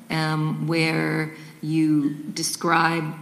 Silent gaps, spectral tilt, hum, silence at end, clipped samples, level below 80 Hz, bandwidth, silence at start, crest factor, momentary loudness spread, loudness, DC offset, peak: none; -5 dB/octave; none; 0 s; under 0.1%; -68 dBFS; 15.5 kHz; 0 s; 18 dB; 7 LU; -23 LUFS; under 0.1%; -4 dBFS